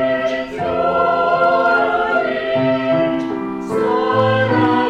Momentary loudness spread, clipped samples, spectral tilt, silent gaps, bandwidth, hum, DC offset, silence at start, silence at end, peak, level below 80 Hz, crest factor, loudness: 7 LU; under 0.1%; -7 dB/octave; none; 9.8 kHz; none; under 0.1%; 0 s; 0 s; -4 dBFS; -50 dBFS; 12 dB; -16 LUFS